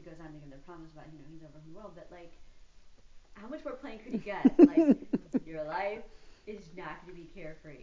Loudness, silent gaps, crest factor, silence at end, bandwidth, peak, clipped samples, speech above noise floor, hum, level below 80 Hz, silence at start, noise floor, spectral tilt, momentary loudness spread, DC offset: -28 LUFS; none; 26 dB; 0.05 s; 7.4 kHz; -6 dBFS; under 0.1%; 22 dB; none; -60 dBFS; 0.05 s; -53 dBFS; -8 dB/octave; 30 LU; under 0.1%